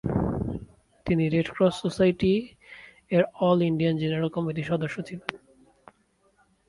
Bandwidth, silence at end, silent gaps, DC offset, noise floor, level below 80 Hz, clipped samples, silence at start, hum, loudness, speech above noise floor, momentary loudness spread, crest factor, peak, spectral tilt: 11.5 kHz; 1.3 s; none; under 0.1%; -66 dBFS; -48 dBFS; under 0.1%; 0.05 s; none; -26 LUFS; 41 dB; 16 LU; 20 dB; -6 dBFS; -7.5 dB/octave